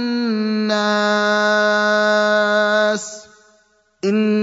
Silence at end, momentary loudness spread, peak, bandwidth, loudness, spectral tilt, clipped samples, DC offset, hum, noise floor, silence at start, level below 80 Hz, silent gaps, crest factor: 0 s; 8 LU; -4 dBFS; 8 kHz; -17 LUFS; -4 dB/octave; under 0.1%; under 0.1%; none; -58 dBFS; 0 s; -72 dBFS; none; 14 dB